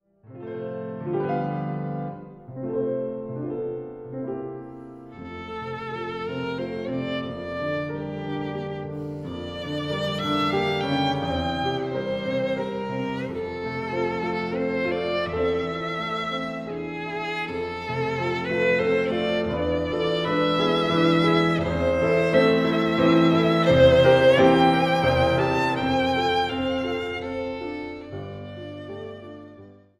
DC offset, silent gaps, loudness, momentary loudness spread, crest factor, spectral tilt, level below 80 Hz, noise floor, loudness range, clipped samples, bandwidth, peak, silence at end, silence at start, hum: under 0.1%; none; -24 LUFS; 16 LU; 20 dB; -6.5 dB/octave; -48 dBFS; -47 dBFS; 13 LU; under 0.1%; 12.5 kHz; -6 dBFS; 0.25 s; 0.3 s; none